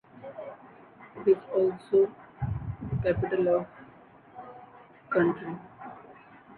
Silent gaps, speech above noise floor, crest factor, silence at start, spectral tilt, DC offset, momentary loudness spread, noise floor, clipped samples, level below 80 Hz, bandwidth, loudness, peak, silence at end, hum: none; 28 dB; 18 dB; 0.15 s; -10.5 dB/octave; under 0.1%; 22 LU; -54 dBFS; under 0.1%; -52 dBFS; 4.4 kHz; -28 LUFS; -12 dBFS; 0.05 s; none